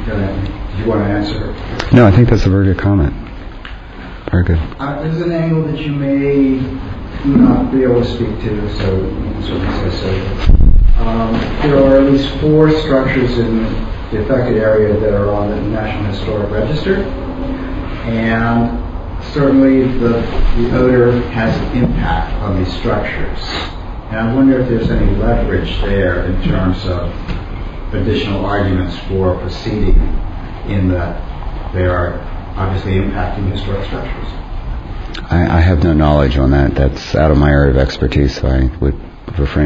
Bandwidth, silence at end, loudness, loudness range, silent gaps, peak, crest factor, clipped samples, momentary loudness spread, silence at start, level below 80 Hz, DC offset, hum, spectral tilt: 7.4 kHz; 0 s; -15 LUFS; 6 LU; none; 0 dBFS; 14 dB; 0.1%; 14 LU; 0 s; -20 dBFS; under 0.1%; none; -8.5 dB/octave